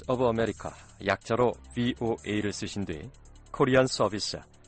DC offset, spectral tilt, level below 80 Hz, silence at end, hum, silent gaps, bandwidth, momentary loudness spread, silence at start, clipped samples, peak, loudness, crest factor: under 0.1%; -5 dB/octave; -52 dBFS; 0.25 s; none; none; 8.8 kHz; 16 LU; 0 s; under 0.1%; -10 dBFS; -28 LUFS; 18 dB